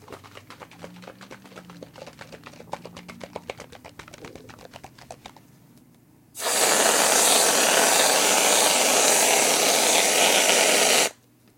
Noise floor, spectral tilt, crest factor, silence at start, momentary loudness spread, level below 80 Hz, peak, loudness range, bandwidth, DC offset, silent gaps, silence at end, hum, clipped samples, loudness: -55 dBFS; 0 dB/octave; 22 dB; 0.1 s; 22 LU; -68 dBFS; -2 dBFS; 8 LU; 17 kHz; under 0.1%; none; 0.45 s; none; under 0.1%; -18 LUFS